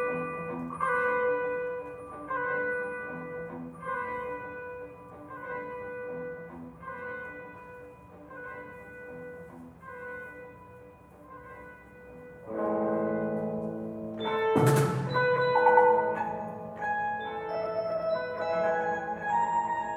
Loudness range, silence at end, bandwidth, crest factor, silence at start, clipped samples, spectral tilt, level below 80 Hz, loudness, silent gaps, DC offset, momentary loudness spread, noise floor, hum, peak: 18 LU; 0 s; 15.5 kHz; 22 dB; 0 s; under 0.1%; -6.5 dB/octave; -64 dBFS; -30 LUFS; none; under 0.1%; 22 LU; -52 dBFS; none; -8 dBFS